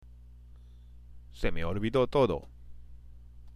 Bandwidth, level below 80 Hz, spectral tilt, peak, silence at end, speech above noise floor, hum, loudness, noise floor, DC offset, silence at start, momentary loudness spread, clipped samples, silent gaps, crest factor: 10.5 kHz; -44 dBFS; -7.5 dB/octave; -12 dBFS; 0 s; 24 dB; 60 Hz at -50 dBFS; -30 LUFS; -51 dBFS; under 0.1%; 0.05 s; 20 LU; under 0.1%; none; 20 dB